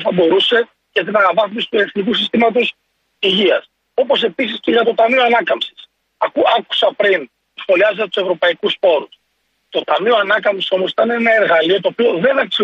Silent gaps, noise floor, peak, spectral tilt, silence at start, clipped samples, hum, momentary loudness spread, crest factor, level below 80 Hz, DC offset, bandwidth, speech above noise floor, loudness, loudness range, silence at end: none; -66 dBFS; -2 dBFS; -5.5 dB/octave; 0 s; under 0.1%; none; 8 LU; 14 dB; -64 dBFS; under 0.1%; 8 kHz; 51 dB; -15 LUFS; 1 LU; 0 s